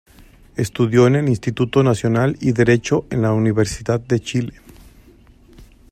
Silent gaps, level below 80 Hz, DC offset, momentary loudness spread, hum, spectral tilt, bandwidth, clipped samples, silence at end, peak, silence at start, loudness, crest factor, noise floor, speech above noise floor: none; -44 dBFS; under 0.1%; 10 LU; none; -6.5 dB/octave; 13.5 kHz; under 0.1%; 0.25 s; -2 dBFS; 0.55 s; -18 LUFS; 18 dB; -48 dBFS; 31 dB